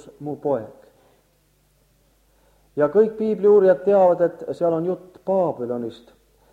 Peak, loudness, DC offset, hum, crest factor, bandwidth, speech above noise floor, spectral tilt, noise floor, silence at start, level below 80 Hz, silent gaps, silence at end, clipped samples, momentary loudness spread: -4 dBFS; -20 LUFS; under 0.1%; none; 16 dB; 7.2 kHz; 42 dB; -9 dB/octave; -62 dBFS; 0.05 s; -64 dBFS; none; 0.6 s; under 0.1%; 15 LU